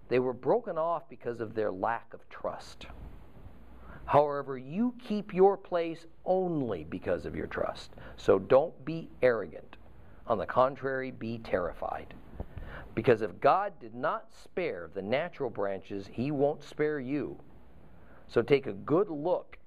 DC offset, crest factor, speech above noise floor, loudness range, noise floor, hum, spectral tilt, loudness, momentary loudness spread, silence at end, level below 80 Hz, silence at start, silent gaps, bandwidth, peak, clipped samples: 0.3%; 20 dB; 25 dB; 4 LU; -56 dBFS; none; -7.5 dB/octave; -31 LUFS; 18 LU; 0.1 s; -56 dBFS; 0.1 s; none; 10.5 kHz; -10 dBFS; under 0.1%